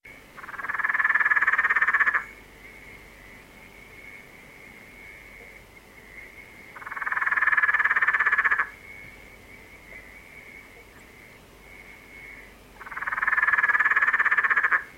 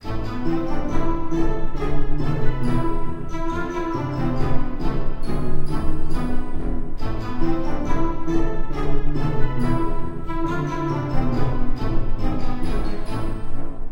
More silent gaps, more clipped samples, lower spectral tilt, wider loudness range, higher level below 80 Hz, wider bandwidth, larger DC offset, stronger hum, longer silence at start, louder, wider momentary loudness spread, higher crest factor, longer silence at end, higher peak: neither; neither; second, -2.5 dB/octave vs -8 dB/octave; first, 21 LU vs 2 LU; second, -58 dBFS vs -22 dBFS; first, 16 kHz vs 5.4 kHz; neither; neither; about the same, 0.05 s vs 0.05 s; first, -22 LUFS vs -26 LUFS; first, 25 LU vs 5 LU; first, 20 dB vs 12 dB; about the same, 0.05 s vs 0 s; about the same, -6 dBFS vs -4 dBFS